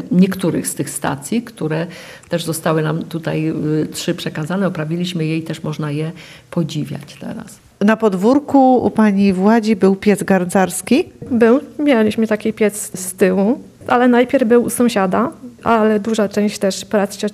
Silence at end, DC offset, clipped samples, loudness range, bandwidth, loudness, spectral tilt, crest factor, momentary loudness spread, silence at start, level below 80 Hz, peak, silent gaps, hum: 0 s; under 0.1%; under 0.1%; 7 LU; 15 kHz; -16 LUFS; -6 dB/octave; 14 dB; 11 LU; 0 s; -54 dBFS; -2 dBFS; none; none